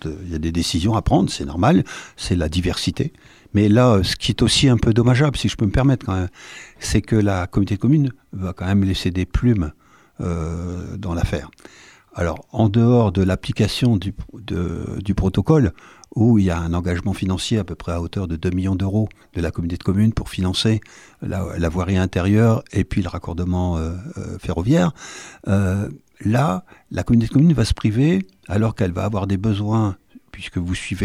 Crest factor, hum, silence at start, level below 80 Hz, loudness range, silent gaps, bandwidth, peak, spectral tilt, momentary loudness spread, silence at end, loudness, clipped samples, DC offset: 16 dB; none; 0 s; -34 dBFS; 5 LU; none; 14 kHz; -2 dBFS; -6.5 dB/octave; 12 LU; 0 s; -20 LUFS; under 0.1%; under 0.1%